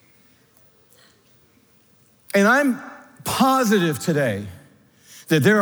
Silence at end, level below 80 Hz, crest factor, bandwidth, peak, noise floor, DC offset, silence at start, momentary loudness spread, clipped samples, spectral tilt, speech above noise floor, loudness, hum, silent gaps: 0 s; -68 dBFS; 18 dB; over 20 kHz; -4 dBFS; -56 dBFS; under 0.1%; 2.35 s; 17 LU; under 0.1%; -5 dB/octave; 38 dB; -20 LUFS; none; none